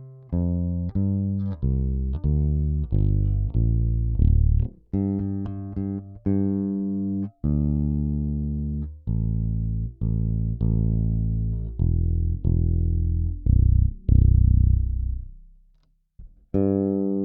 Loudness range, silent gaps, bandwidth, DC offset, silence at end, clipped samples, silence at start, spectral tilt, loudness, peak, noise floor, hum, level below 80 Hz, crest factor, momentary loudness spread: 4 LU; none; 1.8 kHz; under 0.1%; 0 s; under 0.1%; 0 s; -14.5 dB/octave; -24 LUFS; -4 dBFS; -62 dBFS; none; -26 dBFS; 18 dB; 9 LU